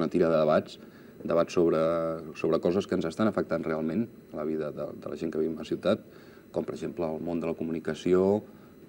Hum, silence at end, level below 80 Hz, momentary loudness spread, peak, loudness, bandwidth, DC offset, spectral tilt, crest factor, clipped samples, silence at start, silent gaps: none; 0 s; -62 dBFS; 11 LU; -10 dBFS; -29 LUFS; 16.5 kHz; under 0.1%; -7 dB/octave; 18 dB; under 0.1%; 0 s; none